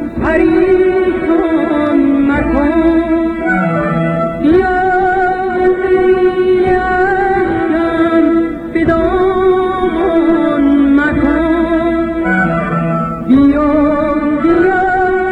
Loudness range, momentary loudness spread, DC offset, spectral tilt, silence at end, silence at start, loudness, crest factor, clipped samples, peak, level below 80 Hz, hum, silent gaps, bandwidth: 1 LU; 4 LU; 0.2%; -8.5 dB/octave; 0 s; 0 s; -12 LUFS; 10 dB; under 0.1%; 0 dBFS; -30 dBFS; none; none; 8 kHz